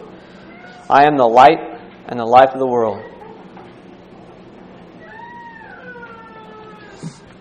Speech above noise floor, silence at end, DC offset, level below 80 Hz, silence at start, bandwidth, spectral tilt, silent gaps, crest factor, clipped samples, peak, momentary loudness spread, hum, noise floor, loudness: 28 dB; 0.3 s; under 0.1%; -56 dBFS; 0.9 s; 9.6 kHz; -6 dB/octave; none; 18 dB; 0.2%; 0 dBFS; 27 LU; none; -40 dBFS; -13 LUFS